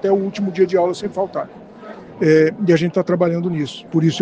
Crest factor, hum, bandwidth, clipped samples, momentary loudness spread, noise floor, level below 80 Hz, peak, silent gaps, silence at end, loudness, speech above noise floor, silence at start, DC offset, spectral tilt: 16 dB; none; 9 kHz; under 0.1%; 19 LU; -37 dBFS; -60 dBFS; -2 dBFS; none; 0 s; -18 LUFS; 20 dB; 0.05 s; under 0.1%; -7 dB/octave